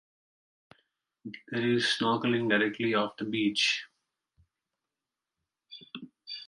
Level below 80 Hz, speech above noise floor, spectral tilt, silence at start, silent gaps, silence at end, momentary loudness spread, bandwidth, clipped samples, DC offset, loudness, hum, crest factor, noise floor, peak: -76 dBFS; 61 dB; -4 dB/octave; 1.25 s; none; 0.05 s; 19 LU; 11.5 kHz; under 0.1%; under 0.1%; -28 LUFS; none; 20 dB; -89 dBFS; -12 dBFS